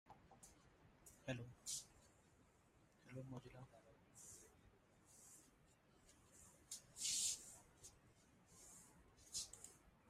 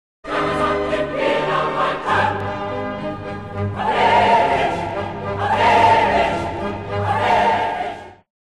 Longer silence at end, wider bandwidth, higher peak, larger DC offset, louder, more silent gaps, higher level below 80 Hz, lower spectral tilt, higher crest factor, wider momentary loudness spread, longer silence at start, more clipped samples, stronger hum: second, 0 s vs 0.4 s; first, 15.5 kHz vs 12 kHz; second, -30 dBFS vs -4 dBFS; second, under 0.1% vs 0.3%; second, -49 LUFS vs -19 LUFS; neither; second, -78 dBFS vs -42 dBFS; second, -1.5 dB/octave vs -5.5 dB/octave; first, 26 dB vs 14 dB; first, 24 LU vs 12 LU; second, 0.05 s vs 0.25 s; neither; neither